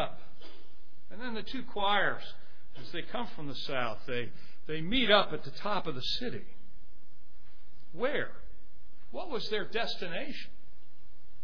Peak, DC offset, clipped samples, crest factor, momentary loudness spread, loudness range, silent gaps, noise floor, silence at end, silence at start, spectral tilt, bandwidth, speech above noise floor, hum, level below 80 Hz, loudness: -8 dBFS; 4%; under 0.1%; 26 dB; 22 LU; 7 LU; none; -62 dBFS; 0.1 s; 0 s; -5 dB/octave; 5.4 kHz; 28 dB; none; -56 dBFS; -33 LUFS